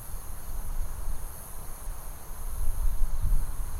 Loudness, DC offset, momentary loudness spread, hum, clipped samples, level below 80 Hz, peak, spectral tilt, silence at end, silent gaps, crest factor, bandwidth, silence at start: -38 LUFS; under 0.1%; 9 LU; none; under 0.1%; -28 dBFS; -10 dBFS; -4.5 dB/octave; 0 s; none; 16 dB; 15.5 kHz; 0 s